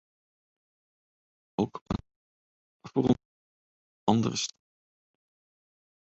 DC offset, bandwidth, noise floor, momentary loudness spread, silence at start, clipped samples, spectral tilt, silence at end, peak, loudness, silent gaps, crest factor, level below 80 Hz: under 0.1%; 8.2 kHz; under -90 dBFS; 10 LU; 1.6 s; under 0.1%; -5.5 dB/octave; 1.65 s; -8 dBFS; -30 LUFS; 1.81-1.86 s, 2.16-2.80 s, 3.25-4.07 s; 26 dB; -56 dBFS